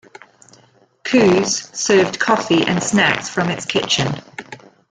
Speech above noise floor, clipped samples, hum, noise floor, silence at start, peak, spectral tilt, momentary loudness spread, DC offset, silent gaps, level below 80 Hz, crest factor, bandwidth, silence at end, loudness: 37 dB; under 0.1%; none; -53 dBFS; 1.05 s; 0 dBFS; -3.5 dB/octave; 12 LU; under 0.1%; none; -54 dBFS; 18 dB; 9.4 kHz; 0.35 s; -16 LUFS